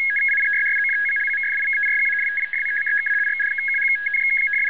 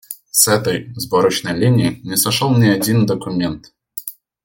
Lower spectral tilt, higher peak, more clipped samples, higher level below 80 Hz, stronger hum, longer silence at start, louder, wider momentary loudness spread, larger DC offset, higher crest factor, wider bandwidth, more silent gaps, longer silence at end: second, 3 dB/octave vs -4.5 dB/octave; second, -12 dBFS vs 0 dBFS; neither; second, -74 dBFS vs -52 dBFS; neither; about the same, 0 s vs 0.1 s; about the same, -18 LUFS vs -16 LUFS; second, 3 LU vs 15 LU; first, 0.5% vs under 0.1%; second, 8 dB vs 16 dB; second, 4 kHz vs 17 kHz; neither; second, 0 s vs 0.35 s